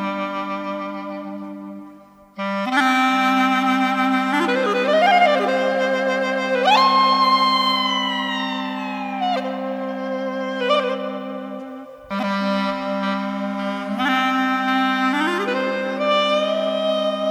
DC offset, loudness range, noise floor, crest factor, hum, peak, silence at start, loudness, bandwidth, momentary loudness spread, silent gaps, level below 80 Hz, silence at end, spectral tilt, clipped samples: under 0.1%; 7 LU; -45 dBFS; 16 dB; none; -4 dBFS; 0 s; -20 LUFS; 14.5 kHz; 14 LU; none; -64 dBFS; 0 s; -4.5 dB/octave; under 0.1%